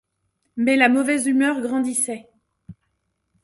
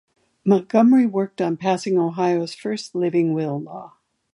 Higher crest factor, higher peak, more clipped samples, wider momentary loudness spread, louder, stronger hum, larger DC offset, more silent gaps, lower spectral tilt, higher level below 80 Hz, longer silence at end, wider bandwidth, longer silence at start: about the same, 20 dB vs 18 dB; about the same, -2 dBFS vs -4 dBFS; neither; about the same, 10 LU vs 12 LU; about the same, -20 LUFS vs -20 LUFS; neither; neither; neither; second, -2.5 dB/octave vs -7 dB/octave; first, -64 dBFS vs -72 dBFS; first, 0.7 s vs 0.45 s; about the same, 11.5 kHz vs 11 kHz; about the same, 0.55 s vs 0.45 s